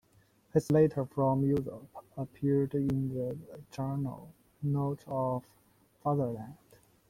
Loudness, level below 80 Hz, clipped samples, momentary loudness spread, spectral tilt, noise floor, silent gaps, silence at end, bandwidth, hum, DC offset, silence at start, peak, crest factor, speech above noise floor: -32 LUFS; -62 dBFS; under 0.1%; 16 LU; -9.5 dB/octave; -66 dBFS; none; 0.55 s; 15 kHz; none; under 0.1%; 0.55 s; -14 dBFS; 20 dB; 35 dB